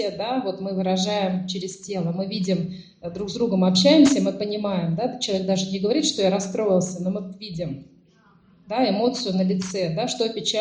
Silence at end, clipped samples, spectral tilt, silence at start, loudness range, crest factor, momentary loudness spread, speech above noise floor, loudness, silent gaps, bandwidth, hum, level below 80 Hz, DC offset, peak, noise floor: 0 s; under 0.1%; -5 dB/octave; 0 s; 5 LU; 20 dB; 13 LU; 34 dB; -23 LUFS; none; 9.8 kHz; none; -60 dBFS; under 0.1%; -2 dBFS; -56 dBFS